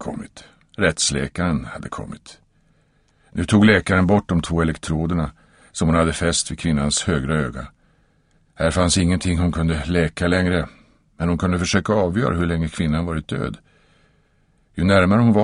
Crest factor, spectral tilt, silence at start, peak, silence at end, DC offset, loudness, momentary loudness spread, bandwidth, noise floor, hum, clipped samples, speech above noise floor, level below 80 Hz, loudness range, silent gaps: 20 dB; -5 dB/octave; 0 s; 0 dBFS; 0 s; under 0.1%; -20 LUFS; 16 LU; 11 kHz; -60 dBFS; none; under 0.1%; 41 dB; -36 dBFS; 3 LU; none